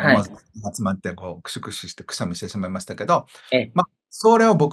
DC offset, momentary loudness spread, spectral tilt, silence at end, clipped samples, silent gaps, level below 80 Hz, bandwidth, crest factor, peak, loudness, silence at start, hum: under 0.1%; 17 LU; -5.5 dB/octave; 0 s; under 0.1%; none; -60 dBFS; 12.5 kHz; 20 dB; 0 dBFS; -22 LUFS; 0 s; none